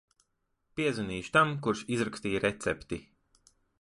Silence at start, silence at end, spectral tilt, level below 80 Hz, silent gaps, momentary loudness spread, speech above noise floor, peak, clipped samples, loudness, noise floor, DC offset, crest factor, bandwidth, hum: 0.75 s; 0.8 s; -5 dB/octave; -58 dBFS; none; 13 LU; 47 dB; -10 dBFS; under 0.1%; -31 LUFS; -78 dBFS; under 0.1%; 22 dB; 11.5 kHz; none